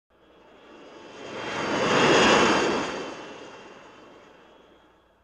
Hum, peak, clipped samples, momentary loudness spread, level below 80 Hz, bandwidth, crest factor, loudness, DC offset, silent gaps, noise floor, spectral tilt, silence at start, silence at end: none; -8 dBFS; under 0.1%; 25 LU; -56 dBFS; 11 kHz; 20 dB; -22 LUFS; under 0.1%; none; -59 dBFS; -3.5 dB/octave; 0.8 s; 1.5 s